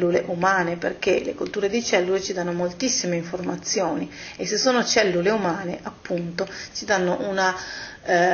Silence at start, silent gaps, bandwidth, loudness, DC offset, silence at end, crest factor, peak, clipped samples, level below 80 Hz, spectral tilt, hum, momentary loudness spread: 0 s; none; 7 kHz; -23 LUFS; under 0.1%; 0 s; 20 dB; -4 dBFS; under 0.1%; -56 dBFS; -3.5 dB/octave; none; 10 LU